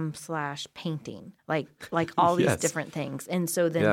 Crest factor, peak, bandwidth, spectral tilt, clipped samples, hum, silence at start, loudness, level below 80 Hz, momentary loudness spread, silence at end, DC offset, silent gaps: 20 dB; -8 dBFS; 17 kHz; -5 dB/octave; under 0.1%; none; 0 s; -28 LUFS; -66 dBFS; 11 LU; 0 s; under 0.1%; none